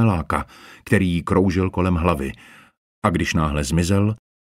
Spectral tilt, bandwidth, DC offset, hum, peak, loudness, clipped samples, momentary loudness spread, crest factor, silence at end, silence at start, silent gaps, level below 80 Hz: -6.5 dB/octave; 15.5 kHz; under 0.1%; none; -2 dBFS; -21 LUFS; under 0.1%; 8 LU; 18 dB; 0.3 s; 0 s; 2.77-3.02 s; -36 dBFS